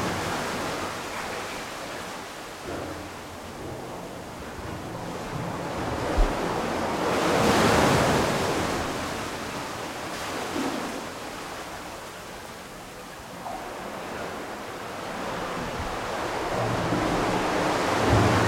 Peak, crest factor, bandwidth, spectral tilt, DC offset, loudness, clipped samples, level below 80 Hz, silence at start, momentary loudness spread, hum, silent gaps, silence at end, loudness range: -8 dBFS; 20 dB; 16.5 kHz; -4.5 dB/octave; under 0.1%; -28 LUFS; under 0.1%; -40 dBFS; 0 s; 16 LU; none; none; 0 s; 12 LU